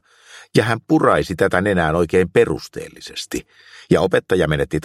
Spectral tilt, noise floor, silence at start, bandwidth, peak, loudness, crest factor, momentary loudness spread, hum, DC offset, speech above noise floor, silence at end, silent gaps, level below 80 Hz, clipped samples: -6 dB/octave; -45 dBFS; 0.35 s; 15 kHz; 0 dBFS; -18 LUFS; 18 dB; 14 LU; none; under 0.1%; 27 dB; 0.05 s; none; -42 dBFS; under 0.1%